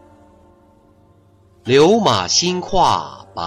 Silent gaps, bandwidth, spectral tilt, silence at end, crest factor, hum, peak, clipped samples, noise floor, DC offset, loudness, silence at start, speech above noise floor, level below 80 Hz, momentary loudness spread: none; 12.5 kHz; -3.5 dB/octave; 0 s; 16 dB; none; -2 dBFS; under 0.1%; -51 dBFS; under 0.1%; -15 LUFS; 1.65 s; 37 dB; -42 dBFS; 13 LU